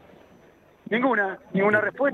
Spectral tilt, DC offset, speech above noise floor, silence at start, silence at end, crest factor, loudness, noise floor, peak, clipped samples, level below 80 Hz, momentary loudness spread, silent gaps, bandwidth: -8 dB/octave; under 0.1%; 32 dB; 0.9 s; 0 s; 18 dB; -23 LUFS; -55 dBFS; -8 dBFS; under 0.1%; -70 dBFS; 5 LU; none; 6.8 kHz